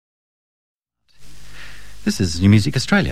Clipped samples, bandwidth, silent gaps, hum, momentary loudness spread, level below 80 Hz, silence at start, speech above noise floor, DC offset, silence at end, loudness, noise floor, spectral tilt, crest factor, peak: under 0.1%; 14.5 kHz; none; 50 Hz at -40 dBFS; 25 LU; -40 dBFS; 0.75 s; 26 dB; 3%; 0 s; -17 LUFS; -42 dBFS; -5.5 dB/octave; 18 dB; -2 dBFS